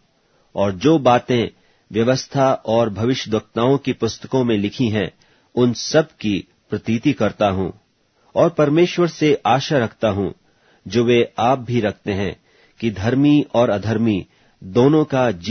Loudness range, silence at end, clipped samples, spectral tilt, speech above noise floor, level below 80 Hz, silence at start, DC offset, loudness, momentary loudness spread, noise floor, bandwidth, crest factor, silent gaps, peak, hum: 2 LU; 0 s; under 0.1%; -6.5 dB/octave; 42 dB; -52 dBFS; 0.55 s; under 0.1%; -19 LUFS; 10 LU; -60 dBFS; 6.6 kHz; 18 dB; none; -2 dBFS; none